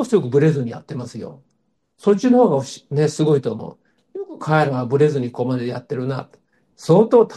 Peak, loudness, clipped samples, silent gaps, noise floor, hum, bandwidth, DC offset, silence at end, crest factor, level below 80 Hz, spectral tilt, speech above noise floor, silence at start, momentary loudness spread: -2 dBFS; -18 LUFS; under 0.1%; none; -69 dBFS; none; 12 kHz; under 0.1%; 0 s; 16 dB; -64 dBFS; -7.5 dB/octave; 51 dB; 0 s; 18 LU